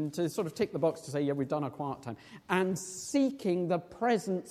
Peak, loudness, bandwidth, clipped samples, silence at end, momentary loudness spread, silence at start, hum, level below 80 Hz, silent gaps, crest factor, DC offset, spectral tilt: -12 dBFS; -32 LUFS; 16 kHz; under 0.1%; 0 s; 8 LU; 0 s; none; -70 dBFS; none; 20 dB; under 0.1%; -5.5 dB/octave